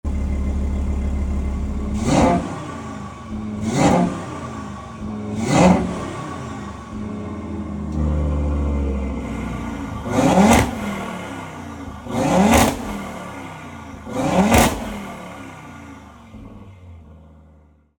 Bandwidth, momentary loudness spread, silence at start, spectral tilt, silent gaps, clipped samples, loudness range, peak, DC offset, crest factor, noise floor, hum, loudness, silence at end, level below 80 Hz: 19.5 kHz; 20 LU; 0.05 s; -5.5 dB/octave; none; under 0.1%; 6 LU; -2 dBFS; under 0.1%; 20 dB; -51 dBFS; none; -21 LUFS; 0.7 s; -30 dBFS